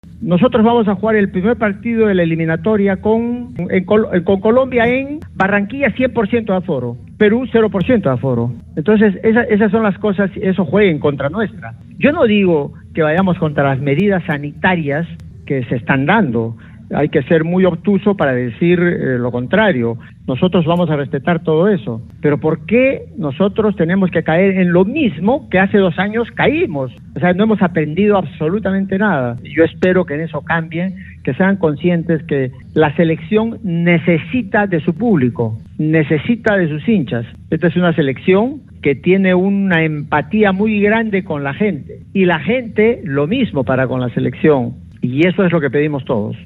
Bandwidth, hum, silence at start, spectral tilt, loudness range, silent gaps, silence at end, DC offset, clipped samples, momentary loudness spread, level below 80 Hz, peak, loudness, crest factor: 4.1 kHz; none; 0.15 s; -9.5 dB/octave; 2 LU; none; 0 s; under 0.1%; under 0.1%; 8 LU; -44 dBFS; 0 dBFS; -15 LUFS; 14 dB